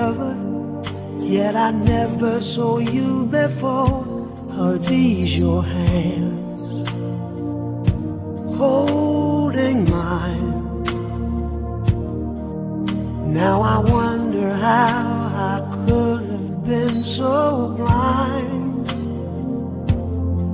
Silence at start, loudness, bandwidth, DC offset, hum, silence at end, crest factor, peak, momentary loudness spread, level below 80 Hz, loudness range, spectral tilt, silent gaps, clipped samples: 0 s; -20 LUFS; 4 kHz; under 0.1%; none; 0 s; 18 dB; -2 dBFS; 9 LU; -32 dBFS; 3 LU; -12 dB/octave; none; under 0.1%